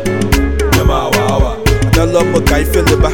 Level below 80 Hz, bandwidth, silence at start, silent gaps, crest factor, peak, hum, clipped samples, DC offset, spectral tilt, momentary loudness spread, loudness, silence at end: -16 dBFS; 18 kHz; 0 s; none; 10 dB; 0 dBFS; none; under 0.1%; under 0.1%; -5.5 dB/octave; 3 LU; -12 LUFS; 0 s